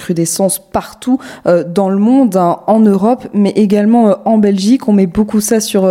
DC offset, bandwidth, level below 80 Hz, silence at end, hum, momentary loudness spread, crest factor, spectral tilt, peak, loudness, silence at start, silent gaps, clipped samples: under 0.1%; 16 kHz; -44 dBFS; 0 s; none; 6 LU; 10 dB; -6 dB/octave; 0 dBFS; -12 LUFS; 0 s; none; under 0.1%